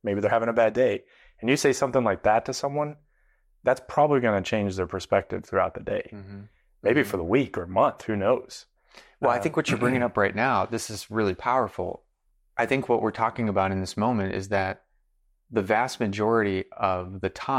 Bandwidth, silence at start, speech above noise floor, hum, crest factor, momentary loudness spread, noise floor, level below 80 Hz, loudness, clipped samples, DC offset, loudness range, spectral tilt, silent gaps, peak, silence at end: 16 kHz; 0.05 s; 43 dB; none; 16 dB; 9 LU; -68 dBFS; -58 dBFS; -25 LUFS; under 0.1%; under 0.1%; 2 LU; -5.5 dB/octave; none; -10 dBFS; 0 s